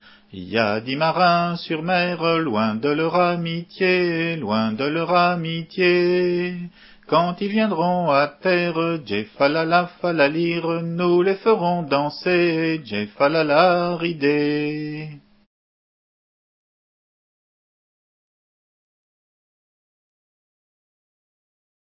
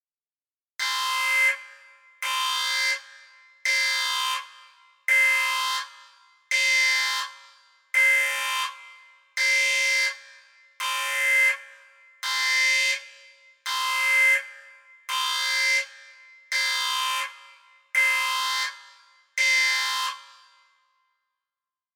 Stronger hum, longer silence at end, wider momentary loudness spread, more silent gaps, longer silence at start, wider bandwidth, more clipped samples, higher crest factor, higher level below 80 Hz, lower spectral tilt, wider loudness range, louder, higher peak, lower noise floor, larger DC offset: neither; first, 6.75 s vs 1.75 s; second, 8 LU vs 13 LU; neither; second, 0.35 s vs 0.8 s; second, 5.8 kHz vs over 20 kHz; neither; about the same, 20 dB vs 16 dB; first, -64 dBFS vs under -90 dBFS; first, -10.5 dB/octave vs 9 dB/octave; about the same, 3 LU vs 3 LU; about the same, -20 LUFS vs -22 LUFS; first, -2 dBFS vs -10 dBFS; about the same, under -90 dBFS vs under -90 dBFS; neither